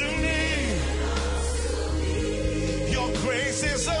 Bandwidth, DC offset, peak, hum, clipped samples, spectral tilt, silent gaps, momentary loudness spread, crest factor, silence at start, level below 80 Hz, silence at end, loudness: 11 kHz; under 0.1%; -12 dBFS; none; under 0.1%; -4 dB/octave; none; 3 LU; 12 dB; 0 s; -30 dBFS; 0 s; -26 LUFS